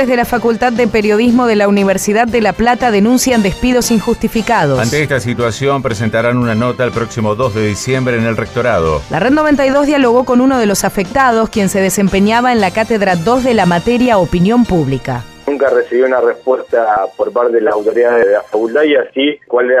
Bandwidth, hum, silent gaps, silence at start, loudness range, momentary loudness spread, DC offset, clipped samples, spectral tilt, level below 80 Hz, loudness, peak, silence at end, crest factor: 15.5 kHz; none; none; 0 s; 3 LU; 5 LU; under 0.1%; under 0.1%; -5.5 dB/octave; -36 dBFS; -12 LUFS; 0 dBFS; 0 s; 10 dB